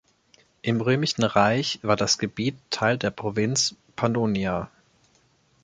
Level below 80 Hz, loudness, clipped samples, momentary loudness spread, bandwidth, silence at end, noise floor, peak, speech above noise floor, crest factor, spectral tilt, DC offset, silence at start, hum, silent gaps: -56 dBFS; -24 LUFS; under 0.1%; 7 LU; 9.6 kHz; 0.95 s; -63 dBFS; -4 dBFS; 39 dB; 22 dB; -4 dB/octave; under 0.1%; 0.65 s; none; none